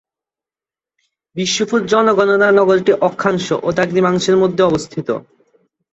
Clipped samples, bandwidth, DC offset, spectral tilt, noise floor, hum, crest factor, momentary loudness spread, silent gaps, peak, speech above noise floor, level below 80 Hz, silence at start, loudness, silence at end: under 0.1%; 8.2 kHz; under 0.1%; -5 dB/octave; under -90 dBFS; none; 14 dB; 11 LU; none; -2 dBFS; over 76 dB; -54 dBFS; 1.35 s; -15 LUFS; 0.75 s